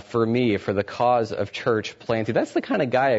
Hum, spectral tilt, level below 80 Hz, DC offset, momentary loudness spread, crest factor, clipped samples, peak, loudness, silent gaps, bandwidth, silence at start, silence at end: none; -6.5 dB/octave; -60 dBFS; under 0.1%; 5 LU; 14 dB; under 0.1%; -8 dBFS; -23 LUFS; none; 8 kHz; 0.1 s; 0 s